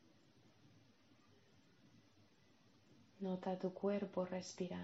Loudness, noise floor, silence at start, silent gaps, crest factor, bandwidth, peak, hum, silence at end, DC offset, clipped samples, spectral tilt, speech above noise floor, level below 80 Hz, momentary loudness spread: -44 LUFS; -72 dBFS; 0.65 s; none; 20 dB; 7.6 kHz; -28 dBFS; none; 0 s; under 0.1%; under 0.1%; -6.5 dB/octave; 29 dB; -88 dBFS; 5 LU